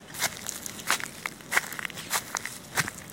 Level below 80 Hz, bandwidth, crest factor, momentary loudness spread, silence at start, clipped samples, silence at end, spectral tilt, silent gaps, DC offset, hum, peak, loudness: -62 dBFS; 17 kHz; 28 dB; 7 LU; 0 s; under 0.1%; 0 s; -1 dB/octave; none; under 0.1%; none; -6 dBFS; -30 LUFS